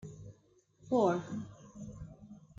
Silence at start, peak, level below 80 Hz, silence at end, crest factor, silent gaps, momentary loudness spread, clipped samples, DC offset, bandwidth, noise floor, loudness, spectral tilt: 0 s; -16 dBFS; -64 dBFS; 0.2 s; 20 dB; none; 23 LU; under 0.1%; under 0.1%; 7.8 kHz; -68 dBFS; -33 LUFS; -7.5 dB/octave